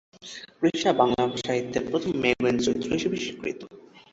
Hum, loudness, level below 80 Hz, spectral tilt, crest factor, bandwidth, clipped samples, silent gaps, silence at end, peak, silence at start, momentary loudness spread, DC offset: none; -25 LUFS; -56 dBFS; -5 dB/octave; 20 dB; 8 kHz; under 0.1%; none; 0.15 s; -6 dBFS; 0.2 s; 18 LU; under 0.1%